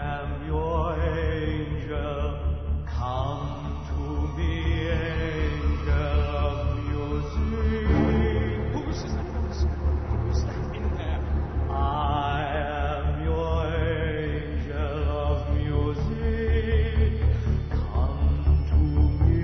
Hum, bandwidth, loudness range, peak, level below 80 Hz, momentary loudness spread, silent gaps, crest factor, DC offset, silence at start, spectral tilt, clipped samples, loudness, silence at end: none; 6.2 kHz; 3 LU; -10 dBFS; -28 dBFS; 7 LU; none; 16 dB; 0.4%; 0 s; -8 dB/octave; under 0.1%; -27 LUFS; 0 s